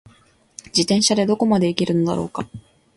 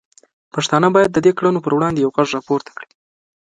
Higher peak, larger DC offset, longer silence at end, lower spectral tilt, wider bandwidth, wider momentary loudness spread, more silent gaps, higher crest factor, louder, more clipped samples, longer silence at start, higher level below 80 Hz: about the same, -2 dBFS vs 0 dBFS; neither; second, 0.35 s vs 0.55 s; about the same, -4.5 dB/octave vs -5.5 dB/octave; about the same, 11.5 kHz vs 10.5 kHz; about the same, 12 LU vs 12 LU; neither; about the same, 20 dB vs 18 dB; second, -19 LUFS vs -16 LUFS; neither; first, 0.75 s vs 0.55 s; about the same, -54 dBFS vs -56 dBFS